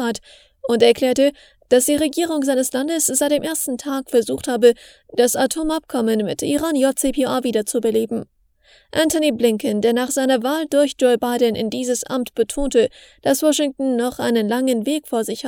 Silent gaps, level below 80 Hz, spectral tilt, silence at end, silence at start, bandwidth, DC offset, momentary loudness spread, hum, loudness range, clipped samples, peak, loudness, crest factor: none; -46 dBFS; -3 dB/octave; 0 s; 0 s; 19 kHz; under 0.1%; 7 LU; none; 2 LU; under 0.1%; 0 dBFS; -19 LUFS; 18 dB